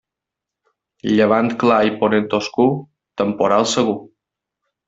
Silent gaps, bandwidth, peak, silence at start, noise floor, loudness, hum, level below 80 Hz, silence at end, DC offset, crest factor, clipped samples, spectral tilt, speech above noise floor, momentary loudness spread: none; 8 kHz; -2 dBFS; 1.05 s; -84 dBFS; -17 LUFS; none; -58 dBFS; 0.85 s; under 0.1%; 16 dB; under 0.1%; -5 dB/octave; 68 dB; 12 LU